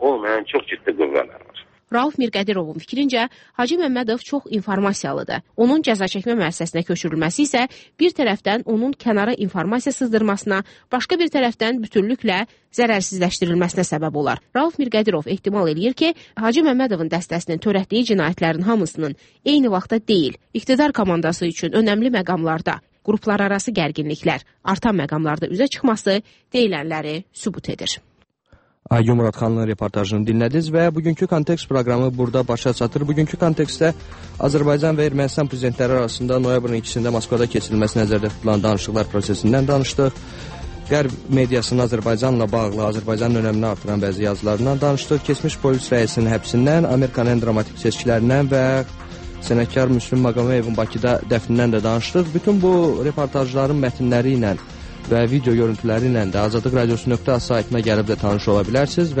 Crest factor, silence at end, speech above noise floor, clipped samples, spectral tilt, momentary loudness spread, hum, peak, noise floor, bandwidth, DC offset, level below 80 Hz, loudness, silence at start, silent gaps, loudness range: 16 dB; 0 s; 37 dB; under 0.1%; -6 dB/octave; 6 LU; none; -4 dBFS; -56 dBFS; 8.8 kHz; under 0.1%; -42 dBFS; -19 LUFS; 0 s; none; 3 LU